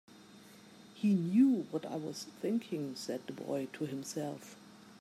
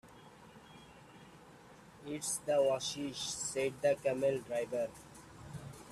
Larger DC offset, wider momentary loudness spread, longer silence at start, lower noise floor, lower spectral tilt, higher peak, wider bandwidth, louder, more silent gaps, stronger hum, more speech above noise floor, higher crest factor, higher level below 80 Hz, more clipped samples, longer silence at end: neither; first, 27 LU vs 24 LU; about the same, 0.1 s vs 0.05 s; about the same, -57 dBFS vs -57 dBFS; first, -6.5 dB/octave vs -3.5 dB/octave; about the same, -18 dBFS vs -18 dBFS; about the same, 14.5 kHz vs 14.5 kHz; about the same, -35 LUFS vs -35 LUFS; neither; neither; about the same, 22 dB vs 22 dB; about the same, 18 dB vs 20 dB; second, -84 dBFS vs -68 dBFS; neither; about the same, 0.05 s vs 0 s